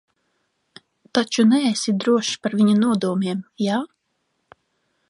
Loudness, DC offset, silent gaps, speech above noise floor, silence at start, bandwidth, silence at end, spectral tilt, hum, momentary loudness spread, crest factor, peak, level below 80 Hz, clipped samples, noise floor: -20 LUFS; under 0.1%; none; 53 dB; 1.15 s; 11.5 kHz; 1.25 s; -5 dB/octave; none; 8 LU; 18 dB; -4 dBFS; -70 dBFS; under 0.1%; -72 dBFS